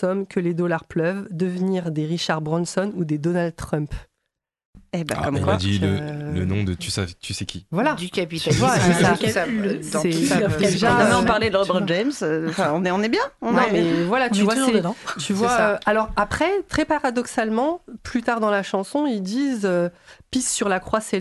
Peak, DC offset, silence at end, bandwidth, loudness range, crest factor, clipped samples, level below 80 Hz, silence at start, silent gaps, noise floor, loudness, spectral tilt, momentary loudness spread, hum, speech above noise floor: -6 dBFS; under 0.1%; 0 s; 12.5 kHz; 6 LU; 16 dB; under 0.1%; -44 dBFS; 0 s; 4.65-4.73 s; -80 dBFS; -22 LUFS; -5 dB/octave; 9 LU; none; 58 dB